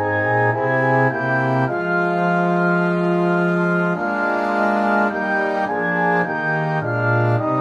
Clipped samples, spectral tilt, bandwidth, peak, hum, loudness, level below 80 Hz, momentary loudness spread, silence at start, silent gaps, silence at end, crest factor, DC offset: under 0.1%; -8.5 dB/octave; 7.4 kHz; -6 dBFS; none; -19 LUFS; -60 dBFS; 3 LU; 0 s; none; 0 s; 12 dB; under 0.1%